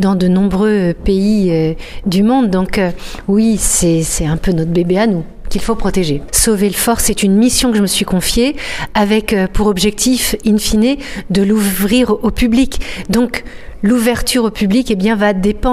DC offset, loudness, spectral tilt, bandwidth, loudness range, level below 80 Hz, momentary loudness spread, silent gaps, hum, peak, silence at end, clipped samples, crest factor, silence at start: under 0.1%; -13 LUFS; -4.5 dB/octave; 16 kHz; 2 LU; -26 dBFS; 6 LU; none; none; 0 dBFS; 0 s; under 0.1%; 12 dB; 0 s